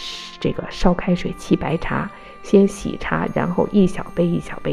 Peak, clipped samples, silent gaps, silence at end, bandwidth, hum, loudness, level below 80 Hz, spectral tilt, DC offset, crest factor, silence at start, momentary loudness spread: -2 dBFS; under 0.1%; none; 0 s; 12 kHz; none; -20 LUFS; -34 dBFS; -7 dB/octave; under 0.1%; 18 dB; 0 s; 9 LU